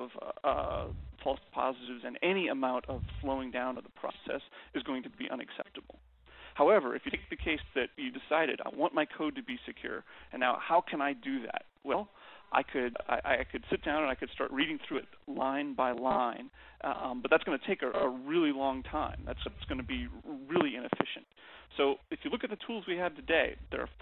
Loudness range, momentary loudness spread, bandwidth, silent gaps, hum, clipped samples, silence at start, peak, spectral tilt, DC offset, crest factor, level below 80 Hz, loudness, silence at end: 3 LU; 12 LU; 4.3 kHz; none; none; under 0.1%; 0 s; -8 dBFS; -3 dB/octave; under 0.1%; 26 dB; -54 dBFS; -34 LUFS; 0 s